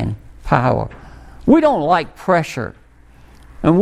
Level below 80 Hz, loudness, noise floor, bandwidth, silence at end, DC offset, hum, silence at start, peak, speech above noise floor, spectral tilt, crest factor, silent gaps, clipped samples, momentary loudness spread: -38 dBFS; -17 LUFS; -45 dBFS; 14 kHz; 0 s; under 0.1%; none; 0 s; 0 dBFS; 30 dB; -7.5 dB/octave; 18 dB; none; under 0.1%; 16 LU